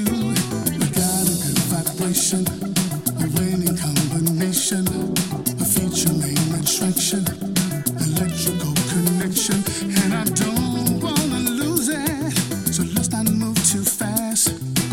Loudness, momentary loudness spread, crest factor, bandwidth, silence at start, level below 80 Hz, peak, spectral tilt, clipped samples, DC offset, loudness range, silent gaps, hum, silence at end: -20 LUFS; 4 LU; 18 dB; 16.5 kHz; 0 s; -46 dBFS; -2 dBFS; -4 dB/octave; under 0.1%; under 0.1%; 1 LU; none; none; 0 s